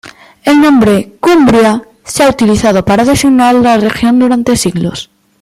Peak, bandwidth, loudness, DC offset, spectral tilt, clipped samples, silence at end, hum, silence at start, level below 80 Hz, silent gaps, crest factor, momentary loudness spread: 0 dBFS; 15 kHz; -9 LUFS; under 0.1%; -5 dB/octave; under 0.1%; 0.4 s; none; 0.05 s; -36 dBFS; none; 8 dB; 10 LU